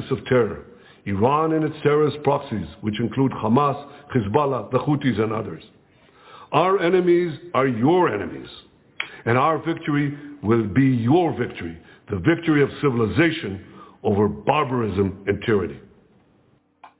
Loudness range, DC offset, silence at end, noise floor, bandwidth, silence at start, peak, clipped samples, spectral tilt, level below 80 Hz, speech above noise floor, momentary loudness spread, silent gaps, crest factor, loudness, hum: 2 LU; under 0.1%; 0.15 s; -60 dBFS; 4 kHz; 0 s; -4 dBFS; under 0.1%; -11.5 dB/octave; -48 dBFS; 39 dB; 13 LU; none; 18 dB; -21 LUFS; none